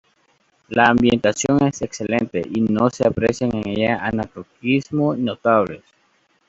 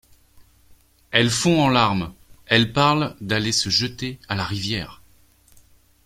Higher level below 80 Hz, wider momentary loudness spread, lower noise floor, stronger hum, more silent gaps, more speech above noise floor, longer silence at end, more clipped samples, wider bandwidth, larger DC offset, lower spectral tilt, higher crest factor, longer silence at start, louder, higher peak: about the same, -50 dBFS vs -50 dBFS; about the same, 10 LU vs 10 LU; first, -62 dBFS vs -56 dBFS; neither; neither; first, 43 dB vs 36 dB; second, 0.7 s vs 1.1 s; neither; second, 8 kHz vs 16 kHz; neither; first, -5.5 dB/octave vs -4 dB/octave; about the same, 18 dB vs 22 dB; first, 0.7 s vs 0.4 s; about the same, -19 LUFS vs -20 LUFS; about the same, -2 dBFS vs -2 dBFS